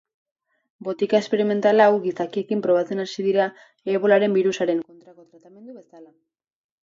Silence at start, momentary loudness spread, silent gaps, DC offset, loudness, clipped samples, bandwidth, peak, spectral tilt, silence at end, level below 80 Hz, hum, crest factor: 0.8 s; 11 LU; none; under 0.1%; -21 LUFS; under 0.1%; 7.6 kHz; -4 dBFS; -6 dB/octave; 0.75 s; -74 dBFS; none; 18 dB